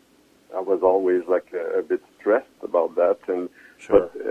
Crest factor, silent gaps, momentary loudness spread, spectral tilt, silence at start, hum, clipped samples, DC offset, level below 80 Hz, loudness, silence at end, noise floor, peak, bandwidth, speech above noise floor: 20 dB; none; 9 LU; -7 dB/octave; 0.5 s; none; under 0.1%; under 0.1%; -58 dBFS; -23 LUFS; 0 s; -57 dBFS; -2 dBFS; 8.6 kHz; 35 dB